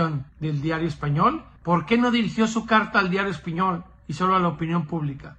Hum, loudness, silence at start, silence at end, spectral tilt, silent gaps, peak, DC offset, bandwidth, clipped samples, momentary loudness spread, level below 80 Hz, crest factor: none; -23 LUFS; 0 s; 0.05 s; -6.5 dB/octave; none; -6 dBFS; under 0.1%; 8.8 kHz; under 0.1%; 9 LU; -50 dBFS; 18 dB